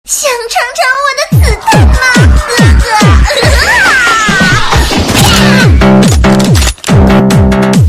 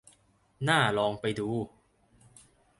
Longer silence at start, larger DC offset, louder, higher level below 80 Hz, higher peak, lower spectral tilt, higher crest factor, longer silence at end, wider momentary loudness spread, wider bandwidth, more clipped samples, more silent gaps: second, 0.05 s vs 0.6 s; neither; first, -6 LUFS vs -29 LUFS; first, -12 dBFS vs -64 dBFS; first, 0 dBFS vs -10 dBFS; about the same, -4.5 dB/octave vs -5 dB/octave; second, 6 dB vs 22 dB; second, 0 s vs 1.1 s; second, 4 LU vs 11 LU; first, 15 kHz vs 11.5 kHz; first, 2% vs under 0.1%; neither